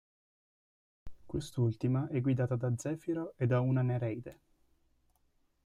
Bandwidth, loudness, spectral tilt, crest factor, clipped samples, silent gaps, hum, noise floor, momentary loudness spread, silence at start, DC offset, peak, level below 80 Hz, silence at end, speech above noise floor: 11.5 kHz; -34 LUFS; -8 dB/octave; 16 dB; under 0.1%; none; none; -73 dBFS; 10 LU; 1.05 s; under 0.1%; -18 dBFS; -60 dBFS; 1.3 s; 41 dB